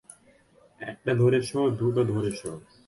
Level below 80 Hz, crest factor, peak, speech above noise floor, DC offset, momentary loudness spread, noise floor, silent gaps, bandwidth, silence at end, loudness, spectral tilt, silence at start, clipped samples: -58 dBFS; 16 dB; -12 dBFS; 33 dB; under 0.1%; 17 LU; -59 dBFS; none; 11.5 kHz; 0.3 s; -26 LUFS; -7 dB/octave; 0.8 s; under 0.1%